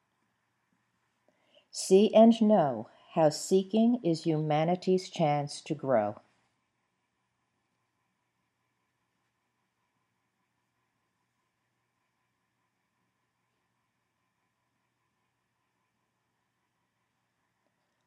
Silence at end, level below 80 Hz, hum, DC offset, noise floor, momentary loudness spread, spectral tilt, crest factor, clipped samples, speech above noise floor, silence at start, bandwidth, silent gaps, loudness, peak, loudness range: 11.9 s; -90 dBFS; none; under 0.1%; -80 dBFS; 15 LU; -6 dB/octave; 24 dB; under 0.1%; 54 dB; 1.75 s; 12.5 kHz; none; -27 LUFS; -8 dBFS; 11 LU